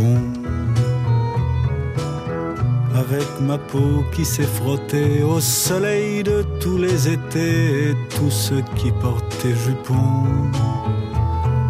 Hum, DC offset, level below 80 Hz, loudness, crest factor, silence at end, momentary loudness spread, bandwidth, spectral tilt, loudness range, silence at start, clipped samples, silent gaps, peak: none; under 0.1%; -34 dBFS; -20 LUFS; 12 dB; 0 s; 5 LU; 15.5 kHz; -6 dB/octave; 2 LU; 0 s; under 0.1%; none; -6 dBFS